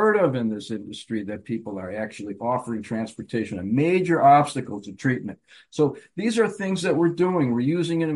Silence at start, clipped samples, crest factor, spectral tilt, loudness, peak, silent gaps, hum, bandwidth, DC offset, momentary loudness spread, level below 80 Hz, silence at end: 0 s; under 0.1%; 18 dB; -6.5 dB/octave; -24 LUFS; -6 dBFS; none; none; 11.5 kHz; under 0.1%; 13 LU; -60 dBFS; 0 s